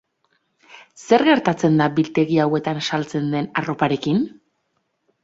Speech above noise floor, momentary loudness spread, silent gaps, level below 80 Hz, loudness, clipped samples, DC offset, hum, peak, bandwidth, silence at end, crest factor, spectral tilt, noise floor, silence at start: 52 dB; 7 LU; none; -60 dBFS; -19 LUFS; under 0.1%; under 0.1%; none; -2 dBFS; 7.8 kHz; 0.95 s; 18 dB; -6.5 dB/octave; -71 dBFS; 0.7 s